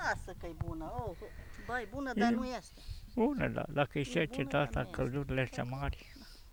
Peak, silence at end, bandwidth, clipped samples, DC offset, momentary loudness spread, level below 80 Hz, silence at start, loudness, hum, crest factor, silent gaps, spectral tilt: -16 dBFS; 0 s; over 20 kHz; under 0.1%; under 0.1%; 17 LU; -50 dBFS; 0 s; -36 LUFS; none; 20 dB; none; -6.5 dB/octave